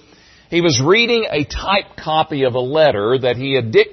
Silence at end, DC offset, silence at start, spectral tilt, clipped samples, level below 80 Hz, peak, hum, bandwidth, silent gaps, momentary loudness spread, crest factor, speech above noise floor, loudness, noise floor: 0 s; under 0.1%; 0.5 s; -4.5 dB/octave; under 0.1%; -40 dBFS; 0 dBFS; none; 6.4 kHz; none; 7 LU; 16 dB; 32 dB; -16 LUFS; -48 dBFS